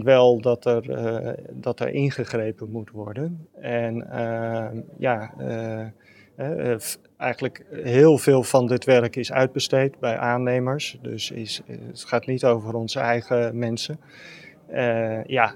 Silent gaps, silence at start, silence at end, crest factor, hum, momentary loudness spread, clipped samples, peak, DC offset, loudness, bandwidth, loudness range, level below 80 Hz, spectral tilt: none; 0 s; 0 s; 22 dB; none; 15 LU; under 0.1%; -2 dBFS; under 0.1%; -23 LUFS; 17.5 kHz; 8 LU; -70 dBFS; -5.5 dB/octave